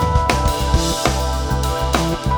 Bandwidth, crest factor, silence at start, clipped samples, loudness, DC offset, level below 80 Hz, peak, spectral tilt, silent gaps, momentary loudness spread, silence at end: over 20 kHz; 18 dB; 0 s; under 0.1%; -18 LUFS; under 0.1%; -22 dBFS; 0 dBFS; -4.5 dB/octave; none; 4 LU; 0 s